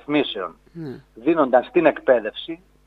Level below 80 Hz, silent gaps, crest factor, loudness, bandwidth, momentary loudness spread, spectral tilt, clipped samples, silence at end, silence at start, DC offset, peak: -58 dBFS; none; 20 dB; -20 LUFS; 4.8 kHz; 18 LU; -7.5 dB/octave; under 0.1%; 0.3 s; 0.1 s; under 0.1%; 0 dBFS